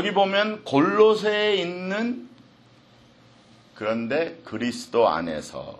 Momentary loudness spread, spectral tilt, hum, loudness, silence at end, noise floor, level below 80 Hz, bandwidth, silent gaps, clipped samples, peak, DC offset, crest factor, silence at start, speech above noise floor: 12 LU; -5 dB/octave; none; -23 LUFS; 0.05 s; -54 dBFS; -64 dBFS; 12 kHz; none; under 0.1%; -4 dBFS; under 0.1%; 20 dB; 0 s; 31 dB